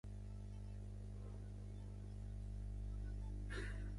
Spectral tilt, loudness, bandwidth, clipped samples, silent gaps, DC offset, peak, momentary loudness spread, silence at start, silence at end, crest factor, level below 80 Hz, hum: -7 dB/octave; -51 LUFS; 11.5 kHz; under 0.1%; none; under 0.1%; -36 dBFS; 5 LU; 0.05 s; 0 s; 12 dB; -50 dBFS; 50 Hz at -50 dBFS